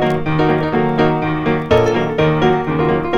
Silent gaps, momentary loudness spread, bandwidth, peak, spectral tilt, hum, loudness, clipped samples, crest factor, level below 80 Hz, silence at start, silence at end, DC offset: none; 3 LU; 7.2 kHz; 0 dBFS; -7.5 dB/octave; none; -15 LUFS; under 0.1%; 14 dB; -36 dBFS; 0 s; 0 s; under 0.1%